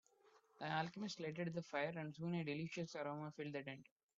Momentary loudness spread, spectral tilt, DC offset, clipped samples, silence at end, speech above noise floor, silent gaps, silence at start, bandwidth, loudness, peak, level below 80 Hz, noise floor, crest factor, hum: 6 LU; -5 dB/octave; under 0.1%; under 0.1%; 0.35 s; 27 dB; none; 0.35 s; 7.6 kHz; -46 LUFS; -26 dBFS; -86 dBFS; -73 dBFS; 20 dB; none